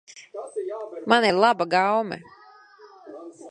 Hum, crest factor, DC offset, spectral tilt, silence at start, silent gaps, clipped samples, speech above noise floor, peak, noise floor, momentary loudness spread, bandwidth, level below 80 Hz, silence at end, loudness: none; 22 dB; under 0.1%; -4.5 dB/octave; 0.15 s; none; under 0.1%; 27 dB; -4 dBFS; -50 dBFS; 23 LU; 11 kHz; -72 dBFS; 0 s; -22 LUFS